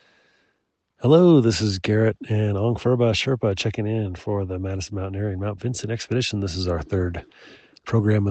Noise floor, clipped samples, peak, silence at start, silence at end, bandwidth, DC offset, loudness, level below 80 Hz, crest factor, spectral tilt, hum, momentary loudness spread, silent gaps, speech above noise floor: -72 dBFS; under 0.1%; -4 dBFS; 1 s; 0 s; 8.6 kHz; under 0.1%; -22 LUFS; -50 dBFS; 18 dB; -6.5 dB/octave; none; 12 LU; none; 51 dB